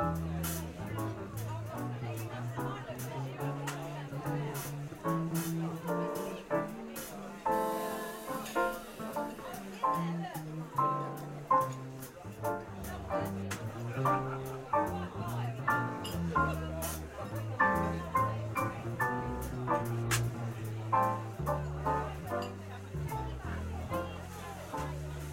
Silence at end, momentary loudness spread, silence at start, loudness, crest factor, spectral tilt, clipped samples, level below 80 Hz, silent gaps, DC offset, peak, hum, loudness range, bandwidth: 0 s; 9 LU; 0 s; -36 LUFS; 20 dB; -5.5 dB/octave; under 0.1%; -52 dBFS; none; under 0.1%; -14 dBFS; none; 5 LU; 16.5 kHz